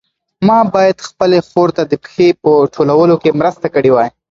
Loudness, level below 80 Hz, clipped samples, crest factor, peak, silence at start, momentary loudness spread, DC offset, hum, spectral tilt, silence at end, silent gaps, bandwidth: -12 LUFS; -52 dBFS; under 0.1%; 12 dB; 0 dBFS; 0.4 s; 5 LU; under 0.1%; none; -7 dB/octave; 0.25 s; none; 7.8 kHz